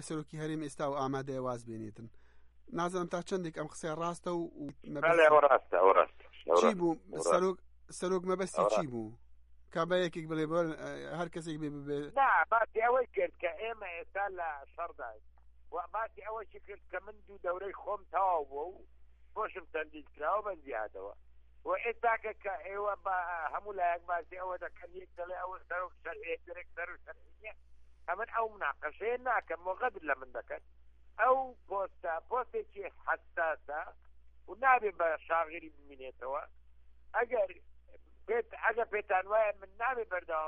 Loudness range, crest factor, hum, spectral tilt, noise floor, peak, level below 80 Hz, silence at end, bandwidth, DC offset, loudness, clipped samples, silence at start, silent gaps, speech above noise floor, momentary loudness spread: 11 LU; 24 dB; none; -5 dB/octave; -56 dBFS; -12 dBFS; -64 dBFS; 0 s; 11.5 kHz; under 0.1%; -34 LUFS; under 0.1%; 0 s; none; 22 dB; 18 LU